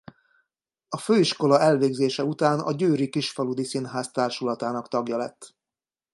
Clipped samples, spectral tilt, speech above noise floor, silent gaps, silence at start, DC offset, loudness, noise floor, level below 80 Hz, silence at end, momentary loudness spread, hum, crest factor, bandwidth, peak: under 0.1%; -5.5 dB/octave; over 66 dB; none; 0.9 s; under 0.1%; -24 LUFS; under -90 dBFS; -74 dBFS; 0.65 s; 10 LU; none; 20 dB; 11.5 kHz; -6 dBFS